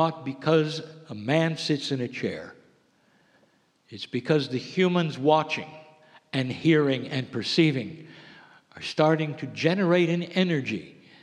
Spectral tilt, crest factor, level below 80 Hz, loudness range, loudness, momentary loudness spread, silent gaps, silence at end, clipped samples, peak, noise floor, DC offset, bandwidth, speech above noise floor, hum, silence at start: -6.5 dB/octave; 20 dB; -74 dBFS; 5 LU; -26 LUFS; 15 LU; none; 0.3 s; under 0.1%; -6 dBFS; -65 dBFS; under 0.1%; 10 kHz; 39 dB; none; 0 s